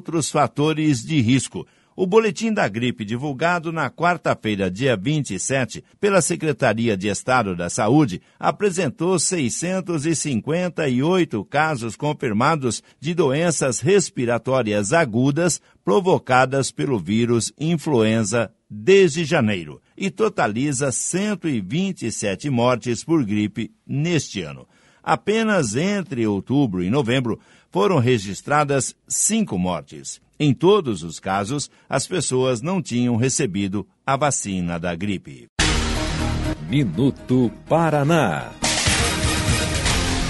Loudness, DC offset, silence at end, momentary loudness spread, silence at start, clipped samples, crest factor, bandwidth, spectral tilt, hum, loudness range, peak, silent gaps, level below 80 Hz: -21 LUFS; under 0.1%; 0 s; 8 LU; 0.1 s; under 0.1%; 20 dB; 11.5 kHz; -4.5 dB/octave; none; 3 LU; -2 dBFS; 35.49-35.56 s; -38 dBFS